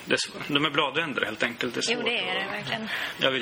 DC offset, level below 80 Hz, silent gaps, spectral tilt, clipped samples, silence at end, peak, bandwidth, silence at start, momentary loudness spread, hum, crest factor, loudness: under 0.1%; -66 dBFS; none; -3 dB/octave; under 0.1%; 0 s; -6 dBFS; over 20 kHz; 0 s; 6 LU; none; 22 dB; -26 LUFS